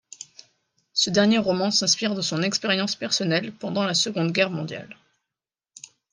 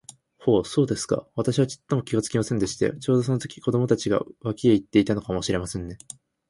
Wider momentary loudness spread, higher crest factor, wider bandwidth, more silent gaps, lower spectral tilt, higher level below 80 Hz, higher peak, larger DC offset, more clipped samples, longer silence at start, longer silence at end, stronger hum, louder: first, 14 LU vs 8 LU; about the same, 18 dB vs 18 dB; about the same, 10.5 kHz vs 11.5 kHz; neither; second, -3.5 dB/octave vs -6 dB/octave; second, -68 dBFS vs -50 dBFS; about the same, -6 dBFS vs -6 dBFS; neither; neither; second, 0.2 s vs 0.4 s; first, 1.2 s vs 0.55 s; neither; about the same, -22 LUFS vs -24 LUFS